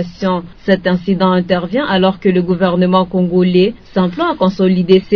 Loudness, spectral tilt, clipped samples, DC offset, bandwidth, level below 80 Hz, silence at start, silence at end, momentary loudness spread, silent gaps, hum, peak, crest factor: -14 LUFS; -8.5 dB/octave; 0.1%; 0.3%; 5.4 kHz; -42 dBFS; 0 s; 0 s; 5 LU; none; none; 0 dBFS; 14 dB